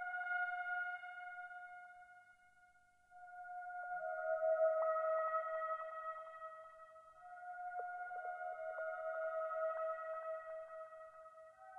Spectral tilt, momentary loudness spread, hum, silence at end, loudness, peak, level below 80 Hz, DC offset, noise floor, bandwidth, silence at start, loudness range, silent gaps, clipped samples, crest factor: -2.5 dB/octave; 20 LU; 50 Hz at -95 dBFS; 0 s; -43 LUFS; -26 dBFS; -86 dBFS; under 0.1%; -70 dBFS; 3.8 kHz; 0 s; 8 LU; none; under 0.1%; 18 dB